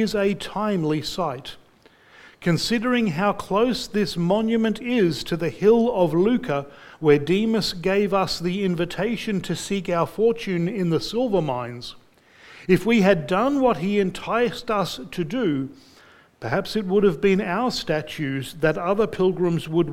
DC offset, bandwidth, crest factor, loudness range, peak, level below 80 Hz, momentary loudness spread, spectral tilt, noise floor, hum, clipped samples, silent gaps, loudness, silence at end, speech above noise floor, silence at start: under 0.1%; 16.5 kHz; 20 dB; 4 LU; -2 dBFS; -50 dBFS; 9 LU; -6 dB/octave; -54 dBFS; none; under 0.1%; none; -22 LUFS; 0 s; 33 dB; 0 s